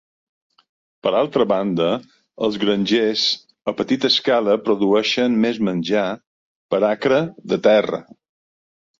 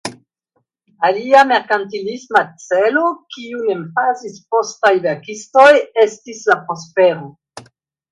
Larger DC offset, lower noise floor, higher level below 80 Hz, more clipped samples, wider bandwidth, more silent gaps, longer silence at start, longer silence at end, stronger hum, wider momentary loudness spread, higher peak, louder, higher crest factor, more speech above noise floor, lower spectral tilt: neither; first, under -90 dBFS vs -68 dBFS; first, -62 dBFS vs -68 dBFS; neither; second, 7.6 kHz vs 11 kHz; first, 6.27-6.69 s vs none; first, 1.05 s vs 0.05 s; first, 1 s vs 0.5 s; neither; second, 9 LU vs 15 LU; about the same, -2 dBFS vs 0 dBFS; second, -19 LUFS vs -15 LUFS; about the same, 18 dB vs 16 dB; first, over 72 dB vs 53 dB; about the same, -5 dB/octave vs -4 dB/octave